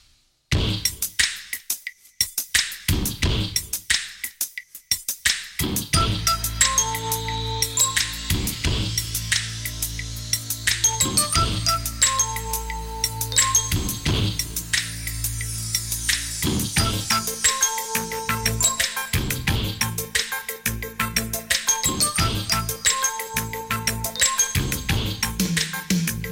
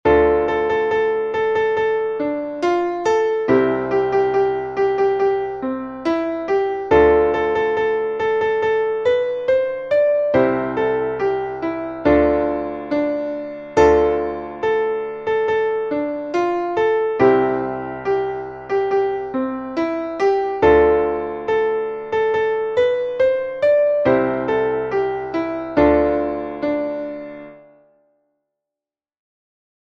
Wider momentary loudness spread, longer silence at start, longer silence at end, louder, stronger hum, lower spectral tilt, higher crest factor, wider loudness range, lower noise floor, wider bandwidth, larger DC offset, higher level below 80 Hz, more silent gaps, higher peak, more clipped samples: about the same, 8 LU vs 9 LU; first, 0.5 s vs 0.05 s; second, 0 s vs 2.3 s; second, -22 LUFS vs -19 LUFS; neither; second, -2 dB/octave vs -6.5 dB/octave; about the same, 20 dB vs 16 dB; about the same, 2 LU vs 3 LU; second, -60 dBFS vs -89 dBFS; first, 17 kHz vs 7.2 kHz; neither; first, -36 dBFS vs -42 dBFS; neither; about the same, -4 dBFS vs -2 dBFS; neither